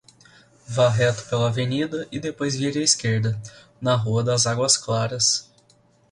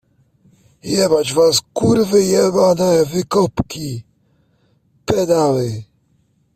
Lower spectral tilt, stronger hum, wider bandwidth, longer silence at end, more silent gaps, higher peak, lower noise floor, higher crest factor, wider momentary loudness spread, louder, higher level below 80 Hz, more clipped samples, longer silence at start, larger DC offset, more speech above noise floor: about the same, -4 dB/octave vs -5 dB/octave; neither; second, 11.5 kHz vs 16 kHz; about the same, 0.7 s vs 0.7 s; neither; about the same, -2 dBFS vs -2 dBFS; about the same, -59 dBFS vs -60 dBFS; about the same, 20 dB vs 16 dB; second, 10 LU vs 14 LU; second, -22 LUFS vs -16 LUFS; second, -56 dBFS vs -48 dBFS; neither; second, 0.7 s vs 0.85 s; neither; second, 37 dB vs 45 dB